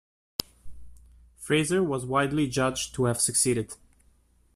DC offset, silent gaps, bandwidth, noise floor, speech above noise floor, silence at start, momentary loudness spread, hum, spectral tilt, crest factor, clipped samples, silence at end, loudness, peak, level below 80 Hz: under 0.1%; none; 15 kHz; -62 dBFS; 37 dB; 0.4 s; 12 LU; none; -4 dB/octave; 24 dB; under 0.1%; 0.8 s; -26 LUFS; -4 dBFS; -54 dBFS